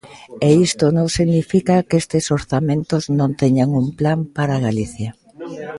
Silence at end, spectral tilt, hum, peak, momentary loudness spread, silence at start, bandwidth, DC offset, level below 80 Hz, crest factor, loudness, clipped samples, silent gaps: 0 s; -6.5 dB/octave; none; 0 dBFS; 11 LU; 0.05 s; 11.5 kHz; under 0.1%; -44 dBFS; 16 dB; -17 LUFS; under 0.1%; none